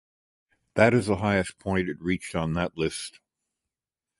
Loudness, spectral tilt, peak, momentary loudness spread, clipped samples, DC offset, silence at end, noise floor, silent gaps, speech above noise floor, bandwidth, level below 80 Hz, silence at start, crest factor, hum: -26 LUFS; -6 dB/octave; -6 dBFS; 10 LU; under 0.1%; under 0.1%; 1.1 s; under -90 dBFS; none; over 65 dB; 11.5 kHz; -50 dBFS; 0.75 s; 22 dB; none